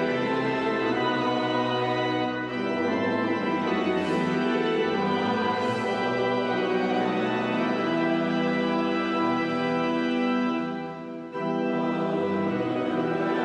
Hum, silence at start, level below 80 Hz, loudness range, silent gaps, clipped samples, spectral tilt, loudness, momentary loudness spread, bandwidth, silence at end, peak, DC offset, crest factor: none; 0 s; -66 dBFS; 2 LU; none; under 0.1%; -6.5 dB/octave; -26 LUFS; 3 LU; 9.4 kHz; 0 s; -12 dBFS; under 0.1%; 14 dB